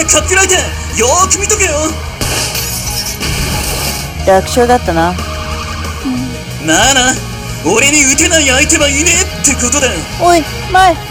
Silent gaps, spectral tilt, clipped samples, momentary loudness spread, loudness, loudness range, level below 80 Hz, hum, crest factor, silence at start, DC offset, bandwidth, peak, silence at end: none; -2.5 dB/octave; 0.4%; 11 LU; -10 LUFS; 5 LU; -24 dBFS; none; 12 dB; 0 s; under 0.1%; over 20 kHz; 0 dBFS; 0 s